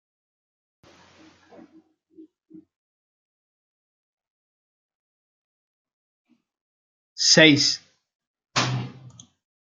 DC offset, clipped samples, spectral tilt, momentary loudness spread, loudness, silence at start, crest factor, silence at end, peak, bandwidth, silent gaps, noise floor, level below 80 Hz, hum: under 0.1%; under 0.1%; -3 dB/octave; 18 LU; -18 LUFS; 7.2 s; 26 dB; 0.75 s; -2 dBFS; 9.8 kHz; 8.15-8.20 s, 8.27-8.34 s; -58 dBFS; -72 dBFS; none